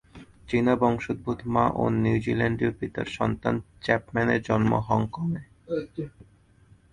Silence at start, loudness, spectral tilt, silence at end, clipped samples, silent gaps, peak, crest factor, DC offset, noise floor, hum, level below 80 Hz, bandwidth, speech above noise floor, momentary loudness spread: 0.15 s; -26 LUFS; -8 dB/octave; 0.85 s; under 0.1%; none; -4 dBFS; 22 dB; under 0.1%; -57 dBFS; none; -50 dBFS; 10.5 kHz; 32 dB; 9 LU